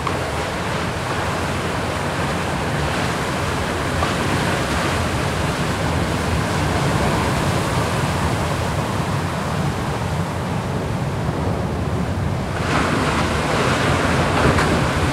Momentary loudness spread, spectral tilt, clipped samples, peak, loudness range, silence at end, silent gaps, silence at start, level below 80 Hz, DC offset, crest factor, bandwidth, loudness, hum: 5 LU; -5 dB/octave; under 0.1%; -2 dBFS; 3 LU; 0 s; none; 0 s; -34 dBFS; under 0.1%; 18 dB; 16 kHz; -20 LUFS; none